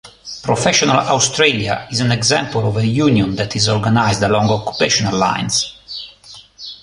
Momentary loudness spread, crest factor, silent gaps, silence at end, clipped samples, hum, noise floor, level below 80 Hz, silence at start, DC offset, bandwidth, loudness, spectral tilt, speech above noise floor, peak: 15 LU; 16 dB; none; 0.1 s; under 0.1%; none; -41 dBFS; -44 dBFS; 0.05 s; under 0.1%; 11.5 kHz; -15 LUFS; -4 dB/octave; 26 dB; 0 dBFS